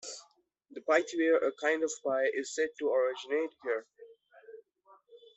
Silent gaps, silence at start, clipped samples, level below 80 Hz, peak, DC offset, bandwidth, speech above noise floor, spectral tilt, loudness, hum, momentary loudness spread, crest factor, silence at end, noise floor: none; 0.05 s; under 0.1%; -82 dBFS; -12 dBFS; under 0.1%; 8.4 kHz; 35 dB; -2 dB/octave; -31 LUFS; none; 12 LU; 22 dB; 0.2 s; -66 dBFS